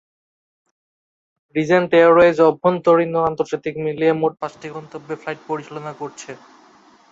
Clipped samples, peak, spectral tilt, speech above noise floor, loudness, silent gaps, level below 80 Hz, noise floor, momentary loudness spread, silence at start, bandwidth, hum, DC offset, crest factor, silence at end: under 0.1%; -2 dBFS; -6.5 dB/octave; 33 dB; -17 LUFS; none; -60 dBFS; -51 dBFS; 20 LU; 1.55 s; 7.8 kHz; none; under 0.1%; 18 dB; 0.75 s